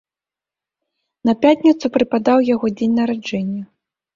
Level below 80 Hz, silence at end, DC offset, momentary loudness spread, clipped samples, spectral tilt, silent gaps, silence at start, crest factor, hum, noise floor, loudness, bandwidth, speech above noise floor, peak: -58 dBFS; 0.5 s; under 0.1%; 10 LU; under 0.1%; -6.5 dB/octave; none; 1.25 s; 18 dB; none; -89 dBFS; -17 LUFS; 7.4 kHz; 73 dB; -2 dBFS